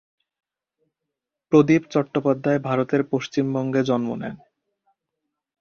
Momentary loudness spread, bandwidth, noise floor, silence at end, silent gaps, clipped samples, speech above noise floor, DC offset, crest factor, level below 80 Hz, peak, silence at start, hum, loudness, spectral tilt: 7 LU; 6.8 kHz; -84 dBFS; 1.25 s; none; under 0.1%; 63 dB; under 0.1%; 20 dB; -64 dBFS; -2 dBFS; 1.5 s; none; -22 LUFS; -7.5 dB/octave